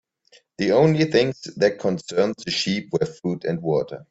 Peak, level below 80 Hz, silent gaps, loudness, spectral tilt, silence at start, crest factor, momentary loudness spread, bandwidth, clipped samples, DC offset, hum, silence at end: -4 dBFS; -60 dBFS; none; -22 LUFS; -5.5 dB/octave; 0.6 s; 18 dB; 9 LU; 8 kHz; under 0.1%; under 0.1%; none; 0.1 s